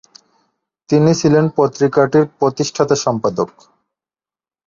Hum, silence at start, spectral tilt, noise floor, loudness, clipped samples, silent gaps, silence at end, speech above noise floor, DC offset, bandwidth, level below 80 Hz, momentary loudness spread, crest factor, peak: none; 0.9 s; -6 dB/octave; under -90 dBFS; -15 LUFS; under 0.1%; none; 1.2 s; over 76 dB; under 0.1%; 7.6 kHz; -56 dBFS; 6 LU; 16 dB; -2 dBFS